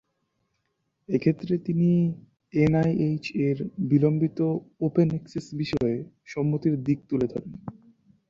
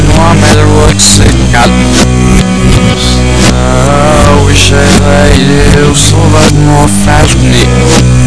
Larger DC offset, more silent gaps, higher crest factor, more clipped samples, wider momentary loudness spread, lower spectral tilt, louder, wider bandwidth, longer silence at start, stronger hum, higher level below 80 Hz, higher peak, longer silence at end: second, under 0.1% vs 10%; neither; first, 16 dB vs 4 dB; second, under 0.1% vs 20%; first, 12 LU vs 3 LU; first, -9 dB/octave vs -4.5 dB/octave; second, -26 LUFS vs -5 LUFS; second, 7.4 kHz vs 11 kHz; first, 1.1 s vs 0 s; neither; second, -56 dBFS vs -12 dBFS; second, -10 dBFS vs 0 dBFS; first, 0.6 s vs 0 s